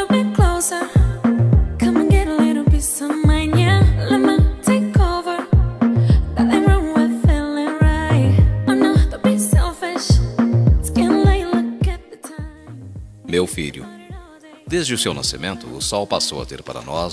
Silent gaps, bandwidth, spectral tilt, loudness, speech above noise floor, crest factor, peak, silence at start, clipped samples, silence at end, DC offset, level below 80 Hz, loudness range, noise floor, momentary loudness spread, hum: none; 11 kHz; -6 dB/octave; -17 LUFS; 18 dB; 14 dB; -2 dBFS; 0 s; under 0.1%; 0 s; under 0.1%; -22 dBFS; 8 LU; -41 dBFS; 14 LU; none